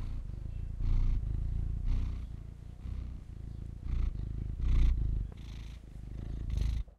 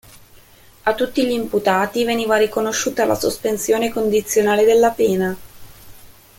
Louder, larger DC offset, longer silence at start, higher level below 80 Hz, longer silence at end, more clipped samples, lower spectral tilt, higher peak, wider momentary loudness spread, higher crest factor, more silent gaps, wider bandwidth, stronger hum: second, -38 LUFS vs -18 LUFS; neither; second, 0 s vs 0.85 s; first, -34 dBFS vs -50 dBFS; second, 0.05 s vs 0.3 s; neither; first, -8 dB/octave vs -4 dB/octave; second, -18 dBFS vs -2 dBFS; first, 14 LU vs 7 LU; about the same, 16 dB vs 16 dB; neither; second, 6.6 kHz vs 17 kHz; neither